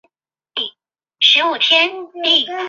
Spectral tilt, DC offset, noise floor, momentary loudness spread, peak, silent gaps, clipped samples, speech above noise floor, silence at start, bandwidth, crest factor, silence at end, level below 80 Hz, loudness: -0.5 dB/octave; under 0.1%; -69 dBFS; 13 LU; -2 dBFS; none; under 0.1%; 53 dB; 0.55 s; 7.6 kHz; 16 dB; 0 s; -76 dBFS; -14 LUFS